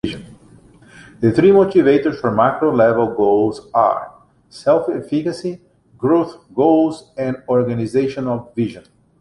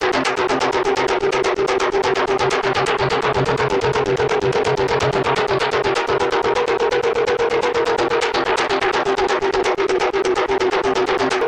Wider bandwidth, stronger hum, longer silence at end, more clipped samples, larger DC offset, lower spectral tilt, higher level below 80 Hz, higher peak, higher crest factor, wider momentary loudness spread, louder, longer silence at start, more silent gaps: about the same, 11 kHz vs 10.5 kHz; neither; first, 0.4 s vs 0 s; neither; neither; first, -8 dB/octave vs -4.5 dB/octave; second, -52 dBFS vs -44 dBFS; about the same, -2 dBFS vs -4 dBFS; about the same, 16 dB vs 14 dB; first, 12 LU vs 1 LU; about the same, -17 LUFS vs -18 LUFS; about the same, 0.05 s vs 0 s; neither